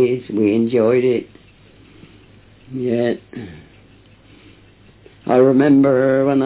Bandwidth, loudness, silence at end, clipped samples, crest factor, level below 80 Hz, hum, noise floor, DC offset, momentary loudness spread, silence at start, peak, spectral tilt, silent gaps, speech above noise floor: 4 kHz; -16 LUFS; 0 s; under 0.1%; 14 dB; -54 dBFS; none; -48 dBFS; under 0.1%; 19 LU; 0 s; -4 dBFS; -12 dB/octave; none; 32 dB